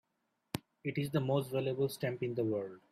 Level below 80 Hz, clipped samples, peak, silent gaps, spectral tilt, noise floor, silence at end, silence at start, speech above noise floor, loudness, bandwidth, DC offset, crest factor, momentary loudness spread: -70 dBFS; under 0.1%; -12 dBFS; none; -6.5 dB/octave; -82 dBFS; 0.15 s; 0.55 s; 47 dB; -36 LUFS; 15.5 kHz; under 0.1%; 24 dB; 10 LU